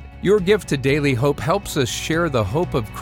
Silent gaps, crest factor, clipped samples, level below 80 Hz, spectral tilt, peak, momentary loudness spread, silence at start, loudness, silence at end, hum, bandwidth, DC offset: none; 14 dB; under 0.1%; -38 dBFS; -5.5 dB/octave; -6 dBFS; 5 LU; 0 s; -20 LUFS; 0 s; none; 17 kHz; under 0.1%